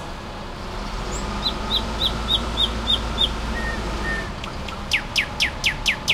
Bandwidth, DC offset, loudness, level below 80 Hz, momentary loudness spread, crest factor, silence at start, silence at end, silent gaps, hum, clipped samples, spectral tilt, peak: 16 kHz; under 0.1%; -23 LUFS; -32 dBFS; 11 LU; 18 dB; 0 s; 0 s; none; none; under 0.1%; -3 dB/octave; -6 dBFS